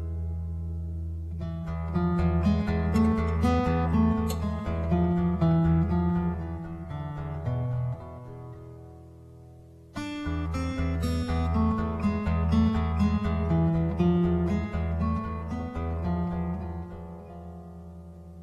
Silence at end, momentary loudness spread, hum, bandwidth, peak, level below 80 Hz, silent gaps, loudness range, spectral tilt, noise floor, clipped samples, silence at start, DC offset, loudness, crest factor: 0 s; 18 LU; none; 12.5 kHz; -12 dBFS; -36 dBFS; none; 10 LU; -8.5 dB/octave; -49 dBFS; under 0.1%; 0 s; under 0.1%; -28 LUFS; 16 dB